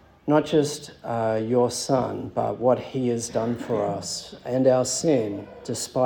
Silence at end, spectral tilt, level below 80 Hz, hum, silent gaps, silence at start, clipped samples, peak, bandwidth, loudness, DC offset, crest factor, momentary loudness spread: 0 s; -5 dB/octave; -60 dBFS; none; none; 0.25 s; under 0.1%; -6 dBFS; 18 kHz; -24 LUFS; under 0.1%; 18 dB; 10 LU